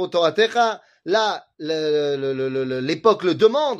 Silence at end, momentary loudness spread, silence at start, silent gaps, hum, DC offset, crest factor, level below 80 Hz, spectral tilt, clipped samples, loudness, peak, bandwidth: 0 s; 7 LU; 0 s; none; none; under 0.1%; 16 dB; -68 dBFS; -5 dB/octave; under 0.1%; -20 LUFS; -4 dBFS; 8 kHz